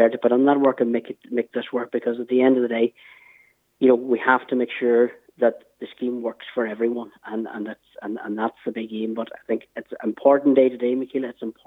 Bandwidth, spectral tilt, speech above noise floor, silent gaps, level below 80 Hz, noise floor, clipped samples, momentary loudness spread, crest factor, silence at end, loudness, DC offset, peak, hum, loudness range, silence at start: 4 kHz; -8 dB/octave; 35 dB; none; -78 dBFS; -57 dBFS; under 0.1%; 13 LU; 20 dB; 0.15 s; -22 LUFS; under 0.1%; -2 dBFS; none; 7 LU; 0 s